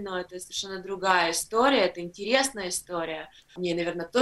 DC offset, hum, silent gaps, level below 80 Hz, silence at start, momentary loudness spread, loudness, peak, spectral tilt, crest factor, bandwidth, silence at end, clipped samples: under 0.1%; none; none; -60 dBFS; 0 s; 12 LU; -27 LUFS; -6 dBFS; -2.5 dB/octave; 22 dB; 13.5 kHz; 0 s; under 0.1%